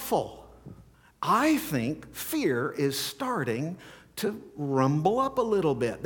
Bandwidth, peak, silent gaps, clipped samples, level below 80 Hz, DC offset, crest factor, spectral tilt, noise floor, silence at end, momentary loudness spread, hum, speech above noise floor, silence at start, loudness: 19 kHz; -10 dBFS; none; under 0.1%; -60 dBFS; under 0.1%; 18 dB; -5.5 dB/octave; -53 dBFS; 0 s; 11 LU; none; 25 dB; 0 s; -28 LUFS